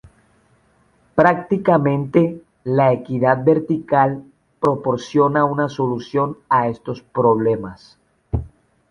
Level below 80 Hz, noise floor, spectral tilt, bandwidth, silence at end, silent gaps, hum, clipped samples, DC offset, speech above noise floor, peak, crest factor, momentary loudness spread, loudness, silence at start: -42 dBFS; -58 dBFS; -8.5 dB/octave; 10 kHz; 0.45 s; none; none; under 0.1%; under 0.1%; 41 dB; -2 dBFS; 18 dB; 11 LU; -18 LUFS; 1.15 s